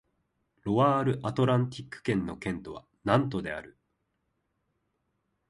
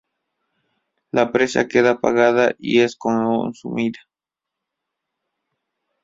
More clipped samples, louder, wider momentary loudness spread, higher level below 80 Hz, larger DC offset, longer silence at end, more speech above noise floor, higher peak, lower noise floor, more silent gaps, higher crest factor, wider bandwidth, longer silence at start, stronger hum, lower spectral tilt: neither; second, -29 LUFS vs -19 LUFS; first, 14 LU vs 8 LU; about the same, -58 dBFS vs -60 dBFS; neither; second, 1.8 s vs 2.1 s; second, 50 dB vs 68 dB; second, -8 dBFS vs -2 dBFS; second, -78 dBFS vs -86 dBFS; neither; about the same, 22 dB vs 20 dB; first, 11.5 kHz vs 7.8 kHz; second, 0.65 s vs 1.15 s; neither; first, -7.5 dB/octave vs -5 dB/octave